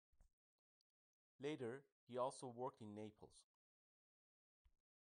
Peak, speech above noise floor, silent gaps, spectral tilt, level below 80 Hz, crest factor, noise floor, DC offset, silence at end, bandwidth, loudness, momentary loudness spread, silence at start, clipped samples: -32 dBFS; over 39 dB; 0.33-1.39 s, 1.92-2.07 s; -5.5 dB/octave; -88 dBFS; 22 dB; under -90 dBFS; under 0.1%; 1.6 s; 10 kHz; -52 LUFS; 12 LU; 0.2 s; under 0.1%